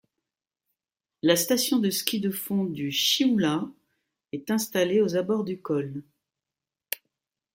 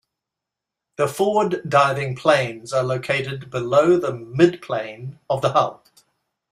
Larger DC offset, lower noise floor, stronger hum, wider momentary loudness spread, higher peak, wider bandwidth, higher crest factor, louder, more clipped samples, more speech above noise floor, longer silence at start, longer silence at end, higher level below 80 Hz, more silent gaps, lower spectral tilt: neither; first, -90 dBFS vs -85 dBFS; neither; first, 14 LU vs 10 LU; about the same, -4 dBFS vs -2 dBFS; about the same, 16.5 kHz vs 15 kHz; about the same, 24 dB vs 20 dB; second, -25 LUFS vs -20 LUFS; neither; about the same, 65 dB vs 65 dB; first, 1.25 s vs 1 s; second, 0.6 s vs 0.8 s; second, -72 dBFS vs -62 dBFS; neither; second, -4 dB/octave vs -6 dB/octave